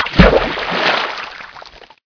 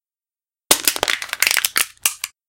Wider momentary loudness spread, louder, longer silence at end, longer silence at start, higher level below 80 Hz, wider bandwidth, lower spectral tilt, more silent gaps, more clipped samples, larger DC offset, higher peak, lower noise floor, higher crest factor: first, 22 LU vs 6 LU; first, -14 LUFS vs -17 LUFS; first, 0.35 s vs 0.2 s; second, 0 s vs 0.7 s; first, -24 dBFS vs -56 dBFS; second, 5.4 kHz vs 17.5 kHz; first, -6 dB/octave vs 1.5 dB/octave; neither; first, 0.2% vs under 0.1%; neither; about the same, 0 dBFS vs 0 dBFS; second, -38 dBFS vs under -90 dBFS; second, 16 dB vs 22 dB